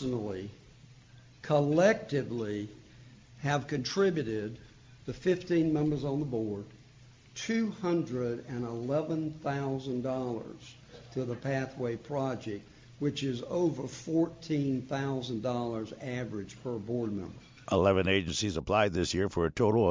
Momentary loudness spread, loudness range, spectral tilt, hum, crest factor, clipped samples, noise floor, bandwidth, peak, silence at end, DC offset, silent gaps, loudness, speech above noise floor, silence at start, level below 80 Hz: 14 LU; 5 LU; -6 dB/octave; none; 20 dB; under 0.1%; -56 dBFS; 7.6 kHz; -12 dBFS; 0 s; under 0.1%; none; -32 LUFS; 25 dB; 0 s; -54 dBFS